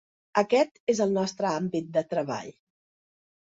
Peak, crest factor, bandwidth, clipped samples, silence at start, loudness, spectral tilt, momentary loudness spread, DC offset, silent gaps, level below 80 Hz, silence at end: -8 dBFS; 20 dB; 8 kHz; under 0.1%; 0.35 s; -27 LUFS; -5.5 dB/octave; 8 LU; under 0.1%; 0.80-0.87 s; -72 dBFS; 1.1 s